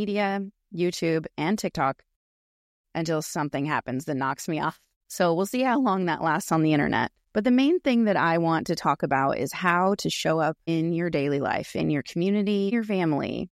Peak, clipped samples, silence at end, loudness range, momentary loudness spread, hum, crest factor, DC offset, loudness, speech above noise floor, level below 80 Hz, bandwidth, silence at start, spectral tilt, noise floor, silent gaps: -8 dBFS; under 0.1%; 0.1 s; 6 LU; 6 LU; none; 18 dB; under 0.1%; -25 LUFS; over 65 dB; -60 dBFS; 16 kHz; 0 s; -5.5 dB/octave; under -90 dBFS; 2.16-2.84 s, 4.96-5.01 s